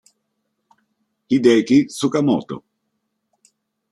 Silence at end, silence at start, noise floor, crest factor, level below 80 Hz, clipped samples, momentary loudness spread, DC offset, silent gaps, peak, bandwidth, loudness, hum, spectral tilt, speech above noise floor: 1.3 s; 1.3 s; -74 dBFS; 18 dB; -64 dBFS; under 0.1%; 14 LU; under 0.1%; none; -2 dBFS; 12.5 kHz; -17 LUFS; none; -6 dB/octave; 57 dB